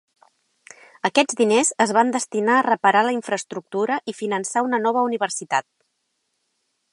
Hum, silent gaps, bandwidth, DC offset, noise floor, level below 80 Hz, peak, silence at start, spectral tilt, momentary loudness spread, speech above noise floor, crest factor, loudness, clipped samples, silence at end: none; none; 11.5 kHz; under 0.1%; -73 dBFS; -76 dBFS; -2 dBFS; 1.05 s; -3 dB/octave; 8 LU; 53 dB; 20 dB; -21 LUFS; under 0.1%; 1.3 s